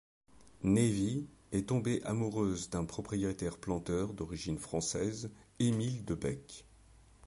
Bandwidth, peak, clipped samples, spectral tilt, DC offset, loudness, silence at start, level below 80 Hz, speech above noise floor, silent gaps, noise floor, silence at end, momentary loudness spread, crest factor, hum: 11.5 kHz; -18 dBFS; under 0.1%; -6 dB/octave; under 0.1%; -36 LUFS; 0.4 s; -56 dBFS; 26 dB; none; -61 dBFS; 0 s; 9 LU; 18 dB; none